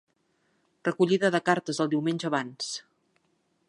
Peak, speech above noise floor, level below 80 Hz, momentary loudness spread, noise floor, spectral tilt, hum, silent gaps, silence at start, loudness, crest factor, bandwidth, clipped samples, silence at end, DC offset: -8 dBFS; 46 dB; -78 dBFS; 11 LU; -72 dBFS; -5 dB/octave; none; none; 0.85 s; -27 LUFS; 22 dB; 11.5 kHz; under 0.1%; 0.9 s; under 0.1%